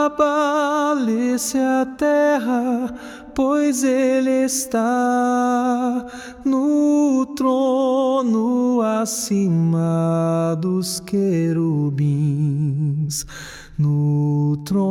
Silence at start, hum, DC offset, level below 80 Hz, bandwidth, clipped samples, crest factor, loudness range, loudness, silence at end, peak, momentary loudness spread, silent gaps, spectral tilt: 0 s; none; under 0.1%; -52 dBFS; 17 kHz; under 0.1%; 12 dB; 2 LU; -19 LUFS; 0 s; -6 dBFS; 6 LU; none; -6 dB/octave